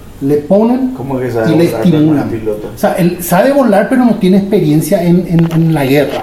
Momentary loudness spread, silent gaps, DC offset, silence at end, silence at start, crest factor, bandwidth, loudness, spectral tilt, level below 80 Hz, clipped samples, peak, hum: 6 LU; none; under 0.1%; 0 s; 0 s; 10 dB; 16 kHz; -11 LUFS; -7 dB/octave; -38 dBFS; 0.2%; 0 dBFS; none